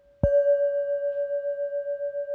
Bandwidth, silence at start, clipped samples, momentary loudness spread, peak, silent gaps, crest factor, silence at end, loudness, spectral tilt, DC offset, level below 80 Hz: 3 kHz; 0.25 s; under 0.1%; 9 LU; -8 dBFS; none; 18 dB; 0 s; -26 LUFS; -10 dB/octave; under 0.1%; -44 dBFS